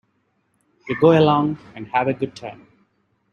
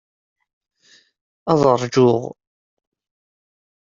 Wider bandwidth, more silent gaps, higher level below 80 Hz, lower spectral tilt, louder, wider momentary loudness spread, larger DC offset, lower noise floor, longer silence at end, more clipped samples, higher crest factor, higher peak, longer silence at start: about the same, 7 kHz vs 7.6 kHz; neither; about the same, -60 dBFS vs -58 dBFS; first, -8 dB/octave vs -6.5 dB/octave; about the same, -19 LUFS vs -17 LUFS; first, 19 LU vs 15 LU; neither; first, -68 dBFS vs -55 dBFS; second, 0.8 s vs 1.6 s; neither; about the same, 20 dB vs 20 dB; about the same, -2 dBFS vs -2 dBFS; second, 0.85 s vs 1.45 s